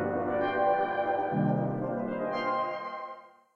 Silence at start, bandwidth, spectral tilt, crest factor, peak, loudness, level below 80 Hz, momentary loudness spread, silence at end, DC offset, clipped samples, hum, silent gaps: 0 s; 6.6 kHz; -9 dB/octave; 16 dB; -16 dBFS; -30 LUFS; -68 dBFS; 11 LU; 0.25 s; under 0.1%; under 0.1%; none; none